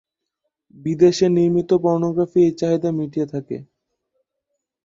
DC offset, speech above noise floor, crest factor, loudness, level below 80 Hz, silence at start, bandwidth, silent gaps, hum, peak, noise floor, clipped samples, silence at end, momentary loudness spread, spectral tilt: under 0.1%; 60 dB; 18 dB; -19 LUFS; -58 dBFS; 0.85 s; 7.6 kHz; none; none; -2 dBFS; -78 dBFS; under 0.1%; 1.25 s; 13 LU; -7.5 dB/octave